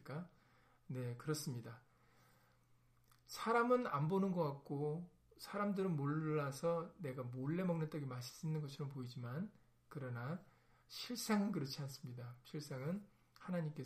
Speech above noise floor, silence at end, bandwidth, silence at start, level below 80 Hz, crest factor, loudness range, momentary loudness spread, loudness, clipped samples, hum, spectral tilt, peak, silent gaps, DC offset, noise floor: 31 dB; 0 s; 15.5 kHz; 0 s; -78 dBFS; 22 dB; 7 LU; 13 LU; -43 LUFS; under 0.1%; none; -6.5 dB/octave; -22 dBFS; none; under 0.1%; -73 dBFS